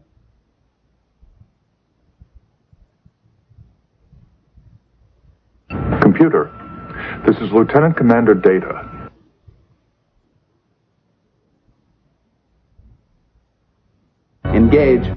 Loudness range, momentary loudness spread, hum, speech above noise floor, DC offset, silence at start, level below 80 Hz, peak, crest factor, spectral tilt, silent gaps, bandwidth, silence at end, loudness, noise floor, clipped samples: 13 LU; 20 LU; none; 51 dB; under 0.1%; 5.7 s; -38 dBFS; 0 dBFS; 20 dB; -10.5 dB/octave; none; 5.6 kHz; 0 s; -15 LUFS; -64 dBFS; under 0.1%